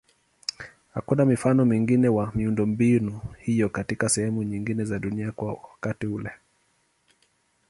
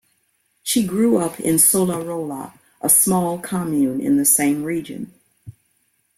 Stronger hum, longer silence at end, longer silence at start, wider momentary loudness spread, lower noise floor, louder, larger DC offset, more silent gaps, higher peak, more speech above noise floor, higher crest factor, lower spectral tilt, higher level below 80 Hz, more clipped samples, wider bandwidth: neither; first, 1.35 s vs 0.65 s; about the same, 0.6 s vs 0.65 s; second, 13 LU vs 18 LU; about the same, -68 dBFS vs -66 dBFS; second, -25 LUFS vs -17 LUFS; neither; neither; second, -8 dBFS vs 0 dBFS; second, 44 dB vs 48 dB; about the same, 18 dB vs 20 dB; first, -6 dB/octave vs -4 dB/octave; first, -52 dBFS vs -58 dBFS; neither; second, 11.5 kHz vs 16.5 kHz